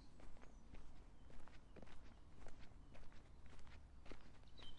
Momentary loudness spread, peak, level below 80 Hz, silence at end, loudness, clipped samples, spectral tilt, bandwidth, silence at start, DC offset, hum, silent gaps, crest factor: 3 LU; -38 dBFS; -62 dBFS; 0 s; -65 LUFS; under 0.1%; -5 dB/octave; 9.8 kHz; 0 s; under 0.1%; none; none; 14 dB